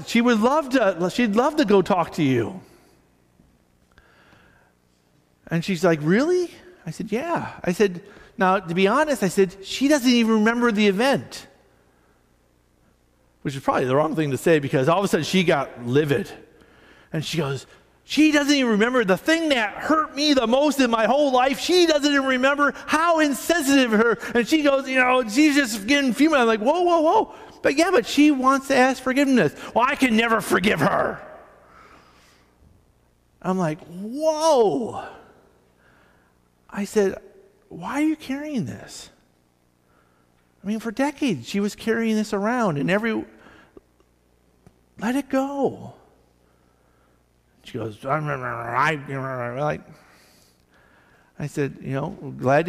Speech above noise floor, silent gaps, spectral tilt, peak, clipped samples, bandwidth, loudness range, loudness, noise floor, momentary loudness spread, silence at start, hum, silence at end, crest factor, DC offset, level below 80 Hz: 42 dB; none; -5 dB/octave; -8 dBFS; under 0.1%; 15.5 kHz; 11 LU; -21 LUFS; -63 dBFS; 14 LU; 0 s; 60 Hz at -55 dBFS; 0 s; 14 dB; under 0.1%; -56 dBFS